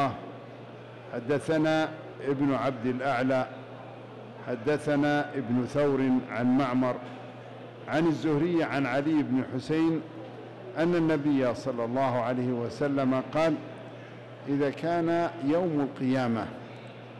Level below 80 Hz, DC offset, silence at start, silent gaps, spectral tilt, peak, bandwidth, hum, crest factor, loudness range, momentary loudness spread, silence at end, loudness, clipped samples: -64 dBFS; under 0.1%; 0 s; none; -7.5 dB/octave; -20 dBFS; 11.5 kHz; none; 8 dB; 2 LU; 18 LU; 0 s; -28 LUFS; under 0.1%